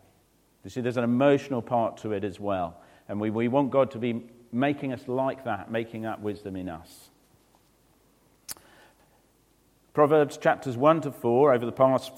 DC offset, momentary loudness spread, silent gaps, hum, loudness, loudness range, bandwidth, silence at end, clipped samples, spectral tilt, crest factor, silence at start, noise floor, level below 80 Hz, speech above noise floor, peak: under 0.1%; 15 LU; none; none; -26 LUFS; 14 LU; 16.5 kHz; 0 s; under 0.1%; -7 dB/octave; 20 dB; 0.65 s; -64 dBFS; -66 dBFS; 38 dB; -6 dBFS